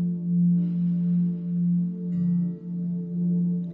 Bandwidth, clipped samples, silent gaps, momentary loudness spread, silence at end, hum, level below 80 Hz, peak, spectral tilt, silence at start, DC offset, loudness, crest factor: 0.9 kHz; under 0.1%; none; 7 LU; 0 s; none; -66 dBFS; -16 dBFS; -14 dB/octave; 0 s; under 0.1%; -25 LUFS; 8 dB